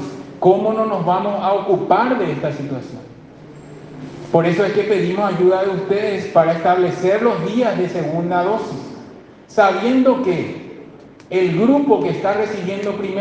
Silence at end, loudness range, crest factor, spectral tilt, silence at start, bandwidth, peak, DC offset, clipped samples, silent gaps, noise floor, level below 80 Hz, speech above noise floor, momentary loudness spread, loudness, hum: 0 s; 4 LU; 18 dB; -7.5 dB/octave; 0 s; 8.2 kHz; 0 dBFS; under 0.1%; under 0.1%; none; -40 dBFS; -60 dBFS; 23 dB; 18 LU; -17 LUFS; none